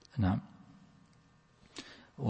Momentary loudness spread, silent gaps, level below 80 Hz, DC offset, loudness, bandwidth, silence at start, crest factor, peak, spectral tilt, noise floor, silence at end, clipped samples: 26 LU; none; -62 dBFS; under 0.1%; -37 LUFS; 8.4 kHz; 0.15 s; 20 dB; -18 dBFS; -7.5 dB/octave; -65 dBFS; 0 s; under 0.1%